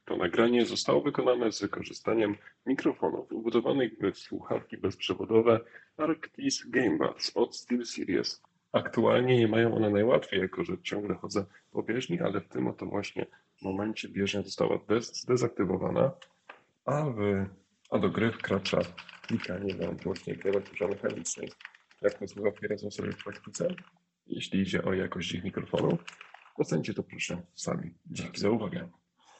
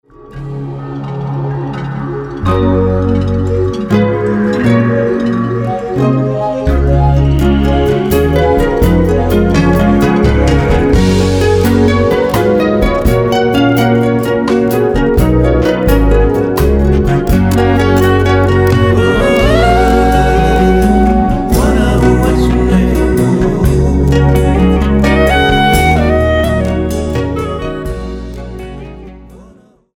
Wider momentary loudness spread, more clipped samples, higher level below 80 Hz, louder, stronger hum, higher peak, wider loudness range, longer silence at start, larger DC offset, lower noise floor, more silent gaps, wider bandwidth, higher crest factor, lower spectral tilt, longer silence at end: about the same, 12 LU vs 10 LU; neither; second, -68 dBFS vs -18 dBFS; second, -31 LUFS vs -11 LUFS; neither; second, -10 dBFS vs 0 dBFS; about the same, 6 LU vs 4 LU; second, 0.05 s vs 0.25 s; neither; first, -56 dBFS vs -42 dBFS; neither; second, 8.8 kHz vs over 20 kHz; first, 22 dB vs 10 dB; second, -5.5 dB/octave vs -7 dB/octave; about the same, 0.5 s vs 0.55 s